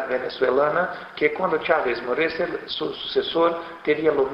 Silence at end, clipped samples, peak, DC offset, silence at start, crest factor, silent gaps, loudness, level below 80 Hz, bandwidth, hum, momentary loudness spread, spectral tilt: 0 s; under 0.1%; -4 dBFS; under 0.1%; 0 s; 18 dB; none; -23 LUFS; -58 dBFS; 5.8 kHz; none; 7 LU; -6.5 dB/octave